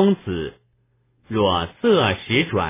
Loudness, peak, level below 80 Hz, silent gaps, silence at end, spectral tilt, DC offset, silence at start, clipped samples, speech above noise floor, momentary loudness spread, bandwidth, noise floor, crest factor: -20 LUFS; -4 dBFS; -42 dBFS; none; 0 s; -10 dB/octave; under 0.1%; 0 s; under 0.1%; 44 dB; 11 LU; 3.8 kHz; -64 dBFS; 16 dB